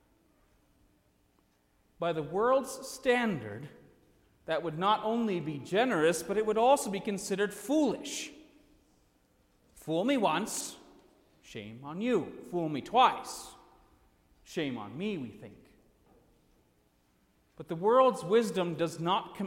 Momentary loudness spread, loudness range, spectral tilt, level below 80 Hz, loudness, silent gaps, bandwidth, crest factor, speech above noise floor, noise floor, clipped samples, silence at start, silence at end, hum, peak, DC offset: 18 LU; 11 LU; -4.5 dB/octave; -68 dBFS; -30 LUFS; none; 16.5 kHz; 20 dB; 40 dB; -70 dBFS; under 0.1%; 2 s; 0 s; none; -12 dBFS; under 0.1%